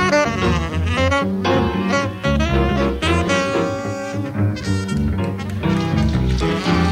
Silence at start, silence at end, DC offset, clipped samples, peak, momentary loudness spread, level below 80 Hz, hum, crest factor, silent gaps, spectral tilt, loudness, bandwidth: 0 s; 0 s; under 0.1%; under 0.1%; -4 dBFS; 5 LU; -28 dBFS; none; 14 dB; none; -6 dB/octave; -19 LUFS; 15 kHz